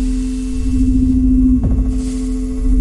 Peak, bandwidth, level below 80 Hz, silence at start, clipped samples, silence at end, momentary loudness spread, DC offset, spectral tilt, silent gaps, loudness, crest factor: -4 dBFS; 11.5 kHz; -18 dBFS; 0 s; under 0.1%; 0 s; 8 LU; under 0.1%; -8 dB/octave; none; -16 LUFS; 10 dB